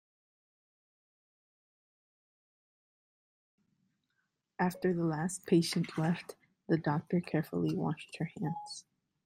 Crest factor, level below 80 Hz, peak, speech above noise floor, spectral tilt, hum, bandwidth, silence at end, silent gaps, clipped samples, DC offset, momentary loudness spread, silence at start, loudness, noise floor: 22 dB; -74 dBFS; -16 dBFS; 49 dB; -6 dB/octave; none; 15.5 kHz; 0.45 s; none; under 0.1%; under 0.1%; 14 LU; 4.6 s; -34 LUFS; -82 dBFS